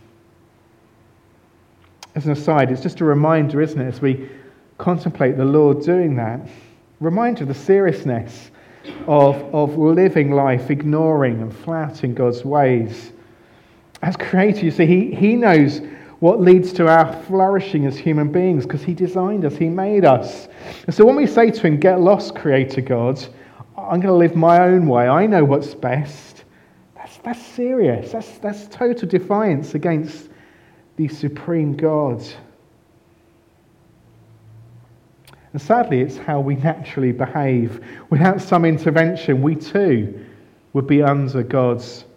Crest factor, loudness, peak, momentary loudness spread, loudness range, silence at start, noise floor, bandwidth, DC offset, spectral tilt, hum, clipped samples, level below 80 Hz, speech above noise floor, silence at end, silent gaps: 16 dB; -17 LUFS; 0 dBFS; 15 LU; 8 LU; 2.15 s; -54 dBFS; 9.4 kHz; under 0.1%; -8.5 dB/octave; none; under 0.1%; -60 dBFS; 38 dB; 0.15 s; none